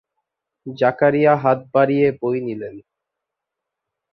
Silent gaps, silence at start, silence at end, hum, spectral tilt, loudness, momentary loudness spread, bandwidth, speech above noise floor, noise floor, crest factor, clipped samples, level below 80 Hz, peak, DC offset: none; 0.65 s; 1.35 s; none; -9.5 dB/octave; -18 LUFS; 18 LU; 6 kHz; 65 dB; -83 dBFS; 18 dB; under 0.1%; -62 dBFS; -2 dBFS; under 0.1%